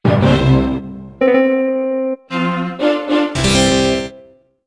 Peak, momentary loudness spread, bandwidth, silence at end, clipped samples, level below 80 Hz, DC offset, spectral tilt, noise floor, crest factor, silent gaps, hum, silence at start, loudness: 0 dBFS; 9 LU; 11 kHz; 0.45 s; under 0.1%; -32 dBFS; under 0.1%; -5.5 dB/octave; -45 dBFS; 14 dB; none; none; 0.05 s; -15 LUFS